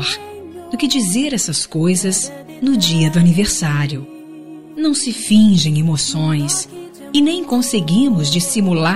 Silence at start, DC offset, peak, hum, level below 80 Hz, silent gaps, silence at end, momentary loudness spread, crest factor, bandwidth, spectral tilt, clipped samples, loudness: 0 s; 0.9%; -2 dBFS; none; -46 dBFS; none; 0 s; 16 LU; 14 dB; 15.5 kHz; -4.5 dB/octave; under 0.1%; -16 LUFS